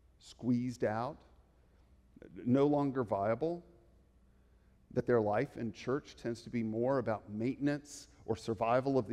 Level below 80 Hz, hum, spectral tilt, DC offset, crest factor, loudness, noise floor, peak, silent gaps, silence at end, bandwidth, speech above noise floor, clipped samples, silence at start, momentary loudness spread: -66 dBFS; none; -7.5 dB/octave; under 0.1%; 18 dB; -35 LUFS; -66 dBFS; -18 dBFS; none; 0 s; 12 kHz; 32 dB; under 0.1%; 0.25 s; 11 LU